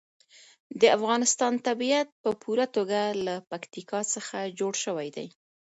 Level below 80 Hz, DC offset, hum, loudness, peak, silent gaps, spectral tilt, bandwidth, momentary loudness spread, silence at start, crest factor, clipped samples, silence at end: -76 dBFS; under 0.1%; none; -27 LUFS; -8 dBFS; 2.12-2.24 s; -2.5 dB/octave; 8.2 kHz; 15 LU; 0.7 s; 22 dB; under 0.1%; 0.45 s